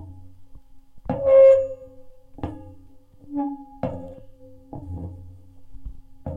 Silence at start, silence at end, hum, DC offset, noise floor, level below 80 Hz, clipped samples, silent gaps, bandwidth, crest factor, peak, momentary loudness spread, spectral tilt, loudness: 0 s; 0 s; none; under 0.1%; -47 dBFS; -46 dBFS; under 0.1%; none; 3.5 kHz; 18 dB; -6 dBFS; 29 LU; -9.5 dB/octave; -19 LUFS